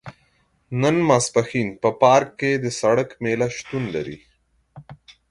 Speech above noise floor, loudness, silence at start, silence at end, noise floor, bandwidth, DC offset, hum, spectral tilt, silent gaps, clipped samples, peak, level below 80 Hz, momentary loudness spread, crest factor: 43 dB; -20 LUFS; 0.05 s; 0.2 s; -63 dBFS; 11.5 kHz; under 0.1%; none; -5 dB/octave; none; under 0.1%; -2 dBFS; -56 dBFS; 11 LU; 20 dB